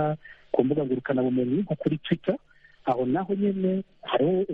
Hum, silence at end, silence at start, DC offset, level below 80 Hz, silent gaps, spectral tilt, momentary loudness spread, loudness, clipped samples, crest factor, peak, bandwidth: none; 0 s; 0 s; under 0.1%; -64 dBFS; none; -10 dB/octave; 6 LU; -27 LUFS; under 0.1%; 18 dB; -8 dBFS; 4.6 kHz